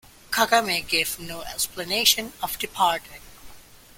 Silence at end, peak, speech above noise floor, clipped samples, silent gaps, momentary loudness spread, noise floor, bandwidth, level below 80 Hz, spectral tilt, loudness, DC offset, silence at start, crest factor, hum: 0.35 s; -2 dBFS; 22 dB; under 0.1%; none; 12 LU; -46 dBFS; 17 kHz; -52 dBFS; -1 dB/octave; -23 LUFS; under 0.1%; 0.3 s; 24 dB; none